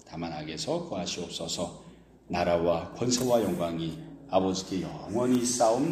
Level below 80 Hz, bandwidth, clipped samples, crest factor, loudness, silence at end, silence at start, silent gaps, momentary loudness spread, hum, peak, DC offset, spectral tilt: -56 dBFS; 15.5 kHz; under 0.1%; 18 dB; -29 LUFS; 0 s; 0.05 s; none; 11 LU; none; -12 dBFS; under 0.1%; -4.5 dB/octave